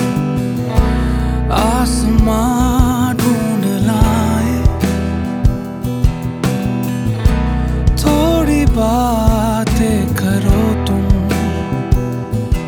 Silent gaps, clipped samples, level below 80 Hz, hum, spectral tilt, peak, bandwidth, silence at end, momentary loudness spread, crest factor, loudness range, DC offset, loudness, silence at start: none; under 0.1%; -20 dBFS; none; -6.5 dB/octave; 0 dBFS; 19.5 kHz; 0 s; 5 LU; 14 dB; 3 LU; under 0.1%; -15 LUFS; 0 s